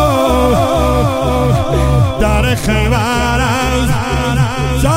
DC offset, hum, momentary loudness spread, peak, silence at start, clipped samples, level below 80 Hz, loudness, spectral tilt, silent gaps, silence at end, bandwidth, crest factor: 0.2%; none; 3 LU; 0 dBFS; 0 s; under 0.1%; -20 dBFS; -13 LUFS; -6 dB/octave; none; 0 s; 16.5 kHz; 12 dB